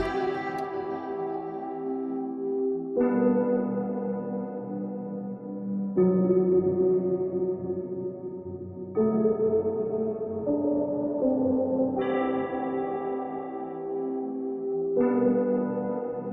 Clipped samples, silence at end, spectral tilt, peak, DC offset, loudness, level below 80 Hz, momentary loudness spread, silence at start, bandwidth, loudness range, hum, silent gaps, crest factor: under 0.1%; 0 s; -10 dB/octave; -12 dBFS; under 0.1%; -28 LUFS; -60 dBFS; 10 LU; 0 s; 5.8 kHz; 3 LU; none; none; 16 dB